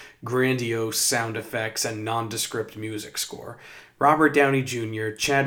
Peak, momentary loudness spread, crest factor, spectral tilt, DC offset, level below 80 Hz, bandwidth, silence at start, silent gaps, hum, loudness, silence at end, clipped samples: -4 dBFS; 13 LU; 20 dB; -3.5 dB/octave; under 0.1%; -62 dBFS; over 20 kHz; 0 s; none; none; -24 LUFS; 0 s; under 0.1%